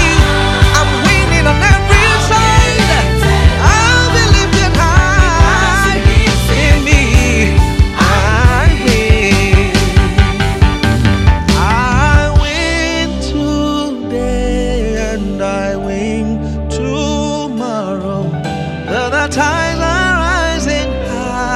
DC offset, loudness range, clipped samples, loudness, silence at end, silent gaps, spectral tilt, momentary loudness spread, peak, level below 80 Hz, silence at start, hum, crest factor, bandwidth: under 0.1%; 7 LU; 0.4%; -12 LUFS; 0 s; none; -5 dB/octave; 9 LU; 0 dBFS; -16 dBFS; 0 s; none; 10 dB; 14 kHz